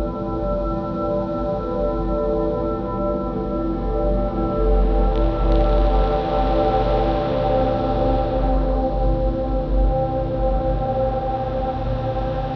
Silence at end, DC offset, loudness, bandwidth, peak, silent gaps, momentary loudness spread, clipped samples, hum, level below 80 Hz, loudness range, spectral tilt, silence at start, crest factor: 0 s; under 0.1%; -22 LUFS; 5.4 kHz; -6 dBFS; none; 5 LU; under 0.1%; none; -24 dBFS; 3 LU; -9.5 dB/octave; 0 s; 12 dB